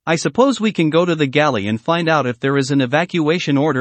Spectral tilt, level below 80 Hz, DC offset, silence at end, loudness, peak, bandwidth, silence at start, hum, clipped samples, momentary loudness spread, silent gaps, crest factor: -5.5 dB/octave; -60 dBFS; under 0.1%; 0 s; -16 LUFS; 0 dBFS; 8.8 kHz; 0.05 s; none; under 0.1%; 3 LU; none; 16 dB